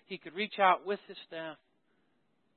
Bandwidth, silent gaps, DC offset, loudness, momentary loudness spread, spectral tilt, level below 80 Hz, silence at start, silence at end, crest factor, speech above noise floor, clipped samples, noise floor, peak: 4.3 kHz; none; under 0.1%; -31 LUFS; 17 LU; -1 dB/octave; -90 dBFS; 0.1 s; 1 s; 24 dB; 43 dB; under 0.1%; -76 dBFS; -12 dBFS